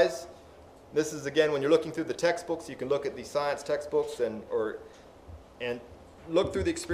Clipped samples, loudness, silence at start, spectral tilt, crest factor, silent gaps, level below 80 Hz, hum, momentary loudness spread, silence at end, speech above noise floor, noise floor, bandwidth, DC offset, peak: under 0.1%; -30 LUFS; 0 s; -4.5 dB/octave; 20 dB; none; -56 dBFS; none; 21 LU; 0 s; 23 dB; -52 dBFS; 15.5 kHz; under 0.1%; -10 dBFS